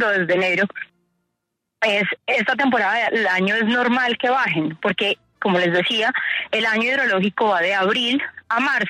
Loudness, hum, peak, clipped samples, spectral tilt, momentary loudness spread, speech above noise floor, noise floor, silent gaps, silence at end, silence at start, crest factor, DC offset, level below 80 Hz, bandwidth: -19 LUFS; none; -8 dBFS; under 0.1%; -5 dB/octave; 5 LU; 59 dB; -78 dBFS; none; 0 s; 0 s; 14 dB; under 0.1%; -68 dBFS; 13 kHz